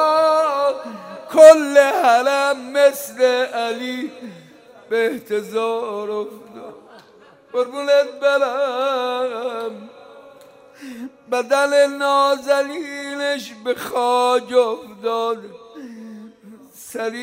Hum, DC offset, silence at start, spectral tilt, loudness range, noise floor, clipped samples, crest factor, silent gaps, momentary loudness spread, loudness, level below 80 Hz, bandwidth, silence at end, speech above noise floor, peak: none; under 0.1%; 0 s; -2.5 dB/octave; 10 LU; -49 dBFS; 0.1%; 18 dB; none; 21 LU; -18 LUFS; -68 dBFS; 16 kHz; 0 s; 31 dB; 0 dBFS